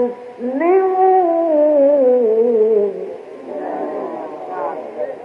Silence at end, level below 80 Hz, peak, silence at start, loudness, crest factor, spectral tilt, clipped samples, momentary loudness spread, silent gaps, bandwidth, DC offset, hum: 0 s; -74 dBFS; -4 dBFS; 0 s; -16 LUFS; 12 dB; -8 dB/octave; under 0.1%; 15 LU; none; 5.2 kHz; under 0.1%; none